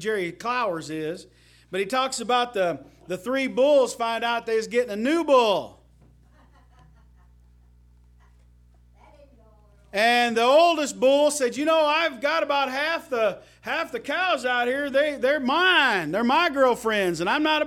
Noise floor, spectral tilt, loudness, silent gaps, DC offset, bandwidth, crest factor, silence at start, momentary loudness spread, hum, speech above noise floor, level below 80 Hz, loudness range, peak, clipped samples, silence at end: -55 dBFS; -3 dB/octave; -22 LUFS; none; under 0.1%; 16.5 kHz; 18 dB; 0 s; 11 LU; 60 Hz at -55 dBFS; 32 dB; -60 dBFS; 6 LU; -6 dBFS; under 0.1%; 0 s